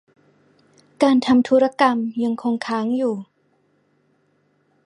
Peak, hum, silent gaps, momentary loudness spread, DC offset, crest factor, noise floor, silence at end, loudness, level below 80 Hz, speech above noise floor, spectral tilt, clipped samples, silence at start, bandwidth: -2 dBFS; 50 Hz at -60 dBFS; none; 8 LU; under 0.1%; 20 dB; -64 dBFS; 1.65 s; -19 LUFS; -66 dBFS; 46 dB; -5.5 dB/octave; under 0.1%; 1 s; 10.5 kHz